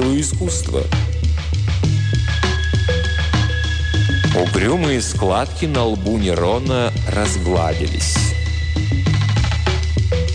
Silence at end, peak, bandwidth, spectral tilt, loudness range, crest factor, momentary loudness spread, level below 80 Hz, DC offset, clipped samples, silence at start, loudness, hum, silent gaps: 0 s; -4 dBFS; 10 kHz; -5 dB/octave; 1 LU; 12 dB; 3 LU; -24 dBFS; under 0.1%; under 0.1%; 0 s; -18 LUFS; none; none